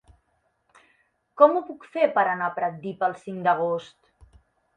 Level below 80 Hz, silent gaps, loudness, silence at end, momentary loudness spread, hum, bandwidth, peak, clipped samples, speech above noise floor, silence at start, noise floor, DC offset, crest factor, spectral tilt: -64 dBFS; none; -24 LUFS; 0.9 s; 11 LU; none; 9.2 kHz; -2 dBFS; under 0.1%; 48 dB; 1.35 s; -71 dBFS; under 0.1%; 24 dB; -7 dB/octave